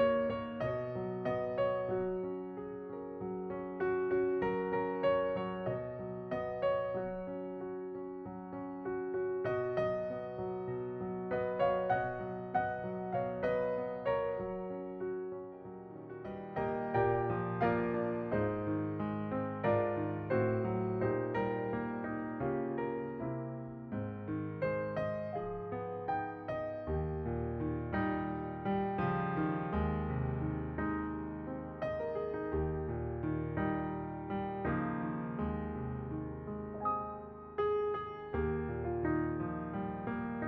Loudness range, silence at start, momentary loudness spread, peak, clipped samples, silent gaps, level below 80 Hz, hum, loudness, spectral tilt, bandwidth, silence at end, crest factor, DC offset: 4 LU; 0 s; 9 LU; -18 dBFS; under 0.1%; none; -56 dBFS; none; -37 LUFS; -10 dB/octave; 5.4 kHz; 0 s; 18 dB; under 0.1%